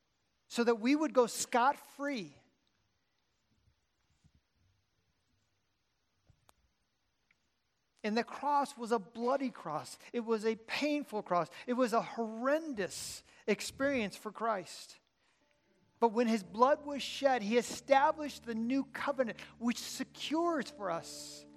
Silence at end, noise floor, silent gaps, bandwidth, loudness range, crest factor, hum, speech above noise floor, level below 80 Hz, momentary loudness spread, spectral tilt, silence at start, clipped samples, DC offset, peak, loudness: 0 s; -81 dBFS; none; 15.5 kHz; 7 LU; 24 dB; none; 47 dB; -76 dBFS; 11 LU; -4 dB/octave; 0.5 s; under 0.1%; under 0.1%; -12 dBFS; -34 LUFS